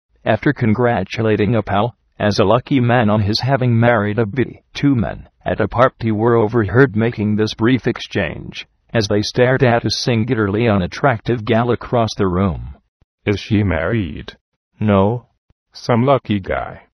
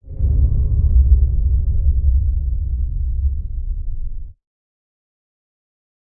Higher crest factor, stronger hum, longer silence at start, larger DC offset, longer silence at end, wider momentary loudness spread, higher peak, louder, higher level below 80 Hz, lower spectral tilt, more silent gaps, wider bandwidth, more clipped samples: about the same, 16 dB vs 16 dB; neither; first, 0.25 s vs 0.05 s; neither; second, 0.2 s vs 1.7 s; second, 9 LU vs 13 LU; about the same, 0 dBFS vs -2 dBFS; about the same, -17 LUFS vs -19 LUFS; second, -40 dBFS vs -18 dBFS; second, -7 dB/octave vs -15.5 dB/octave; first, 12.88-13.18 s, 14.41-14.71 s, 15.38-15.66 s vs none; first, 10.5 kHz vs 0.7 kHz; neither